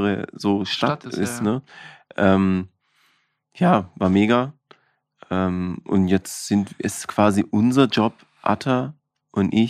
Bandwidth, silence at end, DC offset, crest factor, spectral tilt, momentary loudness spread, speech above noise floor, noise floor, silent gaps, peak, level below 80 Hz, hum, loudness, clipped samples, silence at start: 14.5 kHz; 0 s; under 0.1%; 18 dB; -6 dB/octave; 10 LU; 45 dB; -66 dBFS; none; -4 dBFS; -58 dBFS; none; -21 LUFS; under 0.1%; 0 s